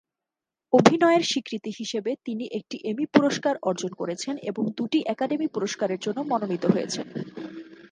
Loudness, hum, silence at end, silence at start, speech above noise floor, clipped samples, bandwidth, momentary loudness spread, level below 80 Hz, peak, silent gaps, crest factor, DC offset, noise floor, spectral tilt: -25 LUFS; none; 0.05 s; 0.7 s; 64 dB; under 0.1%; 10 kHz; 13 LU; -68 dBFS; 0 dBFS; none; 24 dB; under 0.1%; -89 dBFS; -5 dB/octave